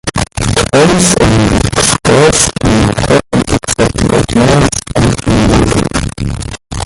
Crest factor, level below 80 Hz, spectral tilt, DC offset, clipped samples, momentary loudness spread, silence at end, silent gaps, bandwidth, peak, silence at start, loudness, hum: 10 dB; -22 dBFS; -4.5 dB/octave; under 0.1%; 0.1%; 8 LU; 0 s; none; 16 kHz; 0 dBFS; 0.05 s; -10 LUFS; none